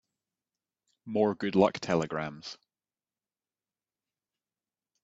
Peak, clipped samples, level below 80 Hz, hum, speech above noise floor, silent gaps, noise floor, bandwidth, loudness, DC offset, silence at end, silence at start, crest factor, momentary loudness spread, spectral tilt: -10 dBFS; under 0.1%; -70 dBFS; 50 Hz at -60 dBFS; over 61 dB; none; under -90 dBFS; 8 kHz; -29 LUFS; under 0.1%; 2.5 s; 1.05 s; 24 dB; 18 LU; -6 dB/octave